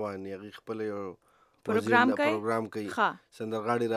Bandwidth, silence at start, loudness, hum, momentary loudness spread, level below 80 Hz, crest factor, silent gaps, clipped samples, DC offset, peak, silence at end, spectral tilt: 14.5 kHz; 0 s; -29 LUFS; none; 17 LU; -78 dBFS; 22 dB; none; under 0.1%; under 0.1%; -8 dBFS; 0 s; -5.5 dB/octave